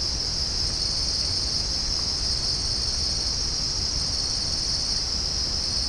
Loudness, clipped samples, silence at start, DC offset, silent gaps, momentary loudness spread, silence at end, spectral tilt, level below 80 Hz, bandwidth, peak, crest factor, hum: -23 LUFS; under 0.1%; 0 s; under 0.1%; none; 1 LU; 0 s; -1.5 dB/octave; -34 dBFS; 10.5 kHz; -12 dBFS; 14 dB; none